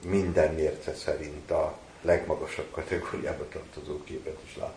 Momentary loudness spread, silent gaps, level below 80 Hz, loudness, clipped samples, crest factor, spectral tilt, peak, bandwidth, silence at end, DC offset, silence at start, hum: 13 LU; none; -48 dBFS; -31 LUFS; under 0.1%; 20 dB; -6 dB/octave; -12 dBFS; 10.5 kHz; 0 s; under 0.1%; 0 s; none